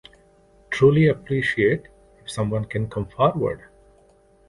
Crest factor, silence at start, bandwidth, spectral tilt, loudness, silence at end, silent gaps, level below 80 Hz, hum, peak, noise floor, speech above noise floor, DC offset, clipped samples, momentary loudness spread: 18 dB; 0.7 s; 11.5 kHz; -7 dB/octave; -22 LUFS; 0.95 s; none; -48 dBFS; none; -4 dBFS; -56 dBFS; 35 dB; under 0.1%; under 0.1%; 14 LU